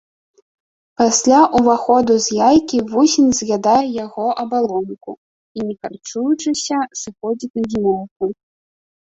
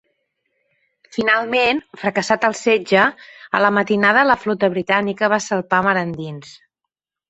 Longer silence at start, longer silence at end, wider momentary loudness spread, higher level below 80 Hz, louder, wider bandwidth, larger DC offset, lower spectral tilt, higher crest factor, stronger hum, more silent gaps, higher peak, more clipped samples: second, 1 s vs 1.15 s; about the same, 0.7 s vs 0.8 s; first, 14 LU vs 8 LU; first, -52 dBFS vs -58 dBFS; about the same, -16 LUFS vs -17 LUFS; about the same, 8.2 kHz vs 8.2 kHz; neither; about the same, -4 dB/octave vs -4.5 dB/octave; about the same, 16 dB vs 18 dB; neither; first, 5.18-5.55 s, 7.50-7.54 s, 8.11-8.20 s vs none; about the same, -2 dBFS vs 0 dBFS; neither